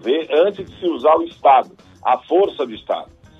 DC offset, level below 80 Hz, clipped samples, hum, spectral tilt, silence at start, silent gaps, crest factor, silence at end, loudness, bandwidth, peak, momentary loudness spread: under 0.1%; -58 dBFS; under 0.1%; none; -6 dB/octave; 0.05 s; none; 16 dB; 0.35 s; -18 LUFS; 7.4 kHz; -2 dBFS; 12 LU